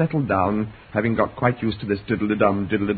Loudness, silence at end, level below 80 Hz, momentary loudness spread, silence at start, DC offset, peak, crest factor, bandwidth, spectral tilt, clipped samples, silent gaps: -22 LUFS; 0 s; -44 dBFS; 6 LU; 0 s; under 0.1%; -2 dBFS; 20 dB; 4.8 kHz; -12 dB/octave; under 0.1%; none